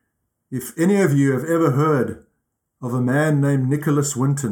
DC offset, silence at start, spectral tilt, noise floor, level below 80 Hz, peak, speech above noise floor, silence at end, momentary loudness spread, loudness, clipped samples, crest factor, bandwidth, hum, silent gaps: under 0.1%; 0.5 s; -7 dB/octave; -74 dBFS; -62 dBFS; -4 dBFS; 55 dB; 0 s; 11 LU; -19 LUFS; under 0.1%; 14 dB; 18 kHz; none; none